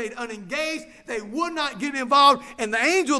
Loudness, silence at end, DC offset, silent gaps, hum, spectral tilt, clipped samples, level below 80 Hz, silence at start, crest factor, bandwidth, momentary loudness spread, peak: -22 LUFS; 0 s; under 0.1%; none; none; -2 dB/octave; under 0.1%; -60 dBFS; 0 s; 18 dB; 11 kHz; 16 LU; -4 dBFS